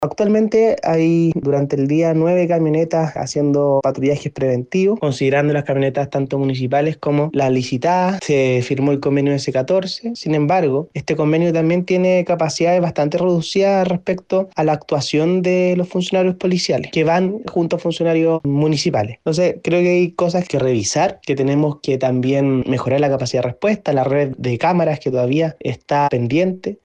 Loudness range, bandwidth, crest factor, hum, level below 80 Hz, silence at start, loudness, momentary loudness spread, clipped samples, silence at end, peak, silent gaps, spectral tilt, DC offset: 1 LU; 9.6 kHz; 12 dB; none; -54 dBFS; 0 s; -17 LUFS; 4 LU; under 0.1%; 0.1 s; -6 dBFS; none; -6.5 dB/octave; under 0.1%